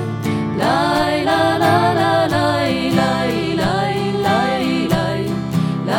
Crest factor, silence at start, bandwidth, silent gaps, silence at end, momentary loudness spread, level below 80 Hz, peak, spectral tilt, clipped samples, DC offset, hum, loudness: 14 dB; 0 s; 17.5 kHz; none; 0 s; 5 LU; -44 dBFS; -2 dBFS; -6 dB/octave; under 0.1%; under 0.1%; none; -17 LUFS